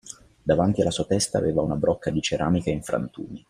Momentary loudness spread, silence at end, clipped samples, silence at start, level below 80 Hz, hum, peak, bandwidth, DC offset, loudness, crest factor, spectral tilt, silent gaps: 7 LU; 0.1 s; under 0.1%; 0.05 s; -48 dBFS; none; -6 dBFS; 15.5 kHz; under 0.1%; -24 LUFS; 18 dB; -5.5 dB/octave; none